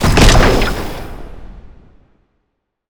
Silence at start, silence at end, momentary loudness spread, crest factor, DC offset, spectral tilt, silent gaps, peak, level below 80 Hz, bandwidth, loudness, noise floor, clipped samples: 0 s; 1.3 s; 25 LU; 14 dB; under 0.1%; -4.5 dB/octave; none; 0 dBFS; -18 dBFS; over 20 kHz; -12 LUFS; -70 dBFS; under 0.1%